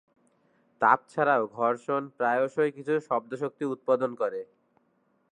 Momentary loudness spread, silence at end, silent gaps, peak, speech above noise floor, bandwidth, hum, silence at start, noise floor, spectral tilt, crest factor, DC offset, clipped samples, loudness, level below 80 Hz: 9 LU; 0.9 s; none; -6 dBFS; 43 dB; 10 kHz; none; 0.8 s; -70 dBFS; -7 dB/octave; 22 dB; under 0.1%; under 0.1%; -27 LUFS; -84 dBFS